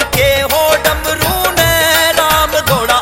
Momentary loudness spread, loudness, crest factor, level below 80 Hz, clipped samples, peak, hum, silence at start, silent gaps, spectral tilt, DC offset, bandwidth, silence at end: 4 LU; -11 LUFS; 12 dB; -28 dBFS; under 0.1%; 0 dBFS; none; 0 s; none; -2.5 dB/octave; under 0.1%; 17.5 kHz; 0 s